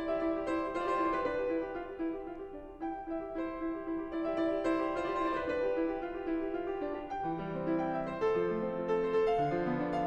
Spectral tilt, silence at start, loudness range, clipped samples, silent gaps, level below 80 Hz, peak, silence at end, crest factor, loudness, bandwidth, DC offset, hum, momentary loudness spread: -7.5 dB/octave; 0 s; 3 LU; under 0.1%; none; -56 dBFS; -20 dBFS; 0 s; 14 dB; -34 LUFS; 8.4 kHz; under 0.1%; none; 7 LU